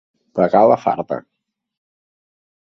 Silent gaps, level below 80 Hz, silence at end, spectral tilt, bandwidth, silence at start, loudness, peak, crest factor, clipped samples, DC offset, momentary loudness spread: none; -62 dBFS; 1.5 s; -8.5 dB/octave; 6.4 kHz; 0.35 s; -16 LUFS; 0 dBFS; 20 dB; under 0.1%; under 0.1%; 15 LU